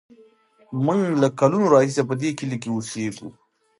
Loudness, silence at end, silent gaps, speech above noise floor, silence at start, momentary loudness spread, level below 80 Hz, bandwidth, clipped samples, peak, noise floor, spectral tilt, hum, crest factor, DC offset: -21 LUFS; 0.5 s; none; 34 dB; 0.7 s; 14 LU; -68 dBFS; 11.5 kHz; under 0.1%; -2 dBFS; -55 dBFS; -6.5 dB/octave; none; 20 dB; under 0.1%